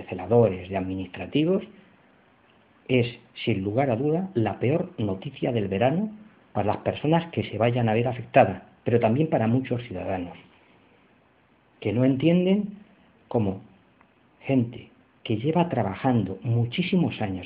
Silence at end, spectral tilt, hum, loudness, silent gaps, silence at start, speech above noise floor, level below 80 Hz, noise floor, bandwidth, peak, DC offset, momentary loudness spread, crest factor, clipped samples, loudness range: 0 s; -6.5 dB/octave; none; -25 LUFS; none; 0 s; 37 dB; -60 dBFS; -61 dBFS; 4.8 kHz; -4 dBFS; under 0.1%; 12 LU; 20 dB; under 0.1%; 4 LU